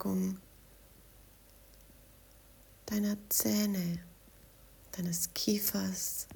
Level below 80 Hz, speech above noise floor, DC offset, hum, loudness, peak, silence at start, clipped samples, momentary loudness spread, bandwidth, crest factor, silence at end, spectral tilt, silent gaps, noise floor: -62 dBFS; 25 dB; under 0.1%; none; -33 LUFS; -16 dBFS; 0 s; under 0.1%; 15 LU; over 20 kHz; 20 dB; 0 s; -4 dB/octave; none; -59 dBFS